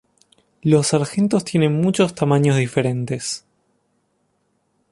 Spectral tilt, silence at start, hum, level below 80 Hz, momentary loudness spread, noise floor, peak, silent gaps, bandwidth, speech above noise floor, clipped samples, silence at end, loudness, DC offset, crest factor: -6 dB/octave; 0.65 s; none; -58 dBFS; 9 LU; -67 dBFS; -4 dBFS; none; 11.5 kHz; 49 dB; under 0.1%; 1.55 s; -19 LUFS; under 0.1%; 18 dB